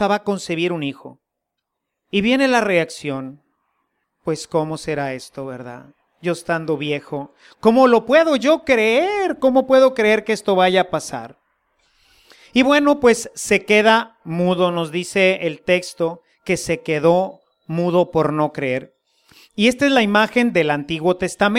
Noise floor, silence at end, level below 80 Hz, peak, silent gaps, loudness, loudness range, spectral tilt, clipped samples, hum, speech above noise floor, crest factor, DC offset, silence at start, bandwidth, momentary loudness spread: -79 dBFS; 0 s; -54 dBFS; -2 dBFS; none; -18 LUFS; 9 LU; -5 dB/octave; under 0.1%; none; 62 dB; 18 dB; under 0.1%; 0 s; 15.5 kHz; 14 LU